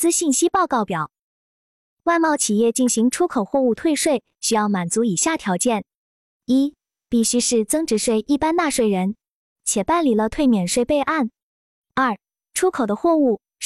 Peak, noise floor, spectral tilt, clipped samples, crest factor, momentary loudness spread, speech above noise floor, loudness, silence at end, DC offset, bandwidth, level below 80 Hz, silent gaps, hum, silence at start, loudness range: -6 dBFS; under -90 dBFS; -4 dB/octave; under 0.1%; 16 dB; 8 LU; over 71 dB; -20 LUFS; 0 s; under 0.1%; 14.5 kHz; -52 dBFS; 1.21-1.97 s, 5.95-6.40 s, 9.31-9.56 s, 11.42-11.82 s; none; 0 s; 2 LU